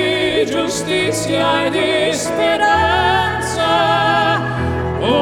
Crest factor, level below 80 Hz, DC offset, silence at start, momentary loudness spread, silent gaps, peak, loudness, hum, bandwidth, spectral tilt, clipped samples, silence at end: 14 dB; -36 dBFS; under 0.1%; 0 s; 5 LU; none; -2 dBFS; -15 LUFS; none; 17.5 kHz; -4 dB/octave; under 0.1%; 0 s